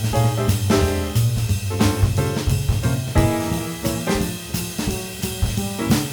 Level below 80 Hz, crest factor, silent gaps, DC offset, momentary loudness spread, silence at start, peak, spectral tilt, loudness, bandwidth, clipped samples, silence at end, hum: -30 dBFS; 16 dB; none; under 0.1%; 6 LU; 0 s; -4 dBFS; -5.5 dB/octave; -21 LUFS; over 20 kHz; under 0.1%; 0 s; none